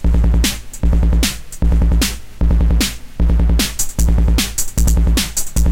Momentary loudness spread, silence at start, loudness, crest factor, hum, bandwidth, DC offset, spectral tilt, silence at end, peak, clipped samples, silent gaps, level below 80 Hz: 5 LU; 0 s; -17 LUFS; 8 dB; none; 17 kHz; under 0.1%; -4 dB/octave; 0 s; -4 dBFS; under 0.1%; none; -14 dBFS